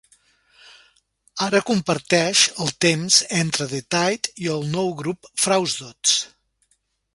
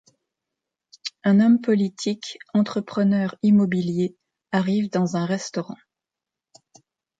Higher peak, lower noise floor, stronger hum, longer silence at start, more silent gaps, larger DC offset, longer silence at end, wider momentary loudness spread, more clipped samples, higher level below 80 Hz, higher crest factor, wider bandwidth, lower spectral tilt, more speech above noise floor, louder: first, -2 dBFS vs -8 dBFS; second, -68 dBFS vs -88 dBFS; neither; first, 1.35 s vs 1.05 s; neither; neither; second, 0.9 s vs 1.45 s; second, 10 LU vs 14 LU; neither; first, -62 dBFS vs -68 dBFS; first, 22 dB vs 16 dB; first, 11.5 kHz vs 7.8 kHz; second, -2.5 dB/octave vs -6.5 dB/octave; second, 47 dB vs 67 dB; about the same, -20 LUFS vs -22 LUFS